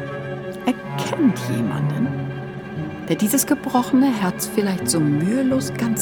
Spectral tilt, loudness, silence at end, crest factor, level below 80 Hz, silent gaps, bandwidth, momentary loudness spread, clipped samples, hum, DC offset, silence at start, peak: -5 dB/octave; -21 LUFS; 0 s; 16 dB; -54 dBFS; none; 19 kHz; 11 LU; under 0.1%; none; under 0.1%; 0 s; -4 dBFS